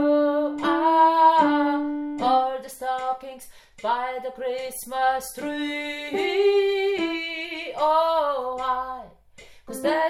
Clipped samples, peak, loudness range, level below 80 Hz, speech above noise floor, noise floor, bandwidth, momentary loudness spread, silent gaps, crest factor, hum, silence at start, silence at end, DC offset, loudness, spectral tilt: under 0.1%; -6 dBFS; 7 LU; -60 dBFS; 25 dB; -49 dBFS; 16.5 kHz; 13 LU; none; 16 dB; none; 0 s; 0 s; under 0.1%; -23 LUFS; -3.5 dB/octave